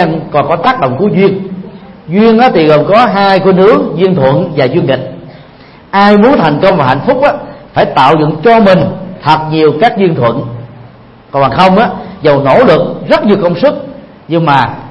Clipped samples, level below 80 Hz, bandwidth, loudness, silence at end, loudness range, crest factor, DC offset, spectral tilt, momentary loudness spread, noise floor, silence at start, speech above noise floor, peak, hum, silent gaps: 0.8%; -40 dBFS; 9.2 kHz; -8 LUFS; 0 s; 2 LU; 8 dB; under 0.1%; -8 dB/octave; 10 LU; -35 dBFS; 0 s; 28 dB; 0 dBFS; none; none